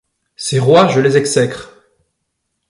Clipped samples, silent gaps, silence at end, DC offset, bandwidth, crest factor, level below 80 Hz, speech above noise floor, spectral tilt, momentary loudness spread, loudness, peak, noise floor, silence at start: under 0.1%; none; 1.05 s; under 0.1%; 11.5 kHz; 16 dB; -54 dBFS; 60 dB; -5 dB/octave; 13 LU; -13 LUFS; 0 dBFS; -72 dBFS; 0.4 s